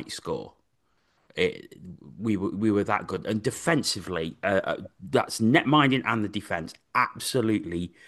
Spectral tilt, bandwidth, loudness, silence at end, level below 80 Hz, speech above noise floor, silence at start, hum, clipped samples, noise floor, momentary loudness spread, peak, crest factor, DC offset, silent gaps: -5 dB/octave; 12.5 kHz; -26 LUFS; 0.2 s; -60 dBFS; 45 dB; 0 s; none; under 0.1%; -72 dBFS; 13 LU; -6 dBFS; 20 dB; under 0.1%; none